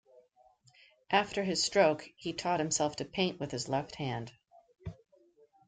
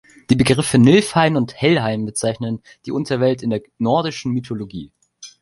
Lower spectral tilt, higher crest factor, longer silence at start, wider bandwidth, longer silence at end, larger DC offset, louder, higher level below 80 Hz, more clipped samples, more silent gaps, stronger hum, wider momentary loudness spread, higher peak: second, -3.5 dB/octave vs -5.5 dB/octave; first, 22 dB vs 16 dB; first, 1.1 s vs 0.3 s; second, 9.6 kHz vs 11.5 kHz; first, 0.75 s vs 0.15 s; neither; second, -32 LUFS vs -18 LUFS; second, -66 dBFS vs -48 dBFS; neither; neither; neither; first, 21 LU vs 15 LU; second, -12 dBFS vs -2 dBFS